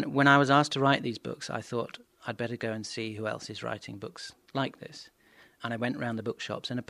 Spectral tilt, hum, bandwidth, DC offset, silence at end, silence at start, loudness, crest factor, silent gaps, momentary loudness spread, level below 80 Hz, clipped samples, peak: -5 dB/octave; none; 12.5 kHz; under 0.1%; 0.05 s; 0 s; -30 LUFS; 24 dB; none; 19 LU; -72 dBFS; under 0.1%; -6 dBFS